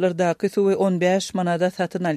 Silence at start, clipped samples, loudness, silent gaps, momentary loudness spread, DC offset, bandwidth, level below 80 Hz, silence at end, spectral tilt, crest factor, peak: 0 s; under 0.1%; -21 LUFS; none; 4 LU; under 0.1%; 13.5 kHz; -66 dBFS; 0 s; -6 dB/octave; 14 dB; -8 dBFS